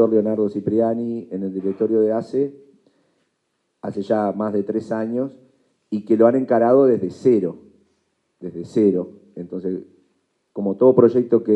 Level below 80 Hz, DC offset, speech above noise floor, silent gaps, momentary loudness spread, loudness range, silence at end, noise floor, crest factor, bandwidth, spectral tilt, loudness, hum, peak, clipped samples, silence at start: -70 dBFS; under 0.1%; 53 dB; none; 15 LU; 7 LU; 0 s; -72 dBFS; 20 dB; 8.4 kHz; -9.5 dB/octave; -20 LUFS; none; 0 dBFS; under 0.1%; 0 s